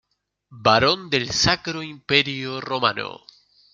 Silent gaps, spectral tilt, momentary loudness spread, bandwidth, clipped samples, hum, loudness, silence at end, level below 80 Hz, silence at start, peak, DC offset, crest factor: none; -3 dB/octave; 13 LU; 12 kHz; under 0.1%; none; -20 LUFS; 0.55 s; -50 dBFS; 0.5 s; -2 dBFS; under 0.1%; 22 dB